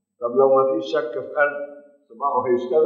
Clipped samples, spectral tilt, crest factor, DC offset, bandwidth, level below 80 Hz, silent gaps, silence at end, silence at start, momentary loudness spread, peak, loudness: under 0.1%; -6.5 dB/octave; 16 dB; under 0.1%; 6.8 kHz; -80 dBFS; none; 0 s; 0.2 s; 10 LU; -4 dBFS; -21 LUFS